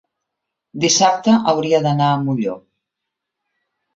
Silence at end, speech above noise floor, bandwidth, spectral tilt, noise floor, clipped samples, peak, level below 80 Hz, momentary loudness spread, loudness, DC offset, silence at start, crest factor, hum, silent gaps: 1.35 s; 65 dB; 7.8 kHz; -4.5 dB/octave; -81 dBFS; under 0.1%; -2 dBFS; -60 dBFS; 11 LU; -16 LUFS; under 0.1%; 0.75 s; 18 dB; none; none